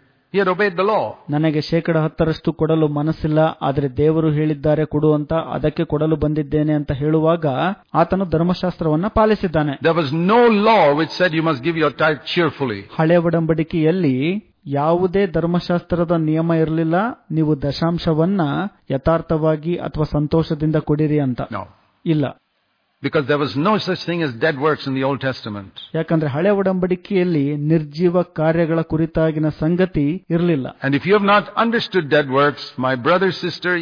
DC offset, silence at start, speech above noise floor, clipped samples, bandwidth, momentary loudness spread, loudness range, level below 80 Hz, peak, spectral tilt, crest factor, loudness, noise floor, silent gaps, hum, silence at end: under 0.1%; 0.35 s; 49 dB; under 0.1%; 5.2 kHz; 6 LU; 4 LU; -42 dBFS; -2 dBFS; -8.5 dB/octave; 14 dB; -18 LUFS; -66 dBFS; none; none; 0 s